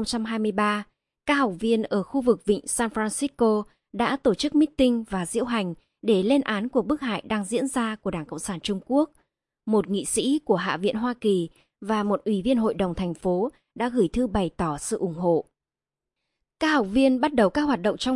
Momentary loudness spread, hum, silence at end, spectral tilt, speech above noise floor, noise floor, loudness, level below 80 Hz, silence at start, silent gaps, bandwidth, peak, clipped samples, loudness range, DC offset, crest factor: 8 LU; none; 0 s; -5 dB/octave; over 66 dB; under -90 dBFS; -25 LUFS; -50 dBFS; 0 s; none; 11.5 kHz; -6 dBFS; under 0.1%; 3 LU; under 0.1%; 18 dB